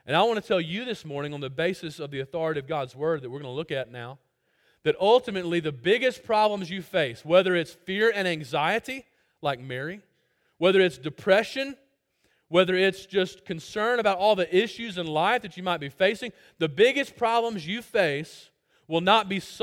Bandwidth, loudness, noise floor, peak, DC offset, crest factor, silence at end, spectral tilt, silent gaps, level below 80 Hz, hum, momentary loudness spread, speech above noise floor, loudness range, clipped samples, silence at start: 16.5 kHz; -26 LUFS; -70 dBFS; -6 dBFS; under 0.1%; 20 dB; 0 s; -5 dB/octave; none; -66 dBFS; none; 13 LU; 45 dB; 5 LU; under 0.1%; 0.05 s